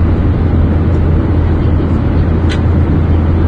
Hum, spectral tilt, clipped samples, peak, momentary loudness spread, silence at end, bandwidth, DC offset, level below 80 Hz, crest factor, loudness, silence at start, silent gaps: none; -9.5 dB/octave; under 0.1%; -2 dBFS; 1 LU; 0 s; 4.8 kHz; under 0.1%; -16 dBFS; 8 dB; -12 LUFS; 0 s; none